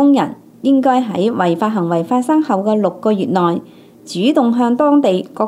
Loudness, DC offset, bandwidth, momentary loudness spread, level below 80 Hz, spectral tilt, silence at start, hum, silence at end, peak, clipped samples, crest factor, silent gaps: -15 LUFS; under 0.1%; 12 kHz; 5 LU; -68 dBFS; -7 dB/octave; 0 s; none; 0 s; 0 dBFS; under 0.1%; 14 dB; none